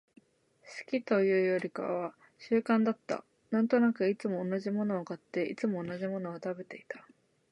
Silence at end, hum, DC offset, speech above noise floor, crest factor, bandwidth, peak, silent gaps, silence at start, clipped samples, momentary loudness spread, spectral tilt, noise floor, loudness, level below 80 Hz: 0.5 s; none; under 0.1%; 33 dB; 18 dB; 10 kHz; -14 dBFS; none; 0.65 s; under 0.1%; 15 LU; -7.5 dB/octave; -64 dBFS; -32 LUFS; -80 dBFS